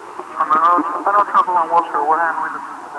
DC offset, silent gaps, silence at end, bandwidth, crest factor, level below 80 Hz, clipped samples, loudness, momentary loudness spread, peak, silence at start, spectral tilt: under 0.1%; none; 0 s; 11 kHz; 14 dB; -72 dBFS; under 0.1%; -16 LUFS; 10 LU; -2 dBFS; 0 s; -4.5 dB/octave